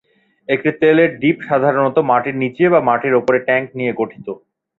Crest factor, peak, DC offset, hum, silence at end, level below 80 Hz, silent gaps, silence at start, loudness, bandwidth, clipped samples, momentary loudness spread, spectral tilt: 14 dB; -2 dBFS; under 0.1%; none; 0.4 s; -60 dBFS; none; 0.5 s; -16 LUFS; 4.4 kHz; under 0.1%; 11 LU; -8.5 dB/octave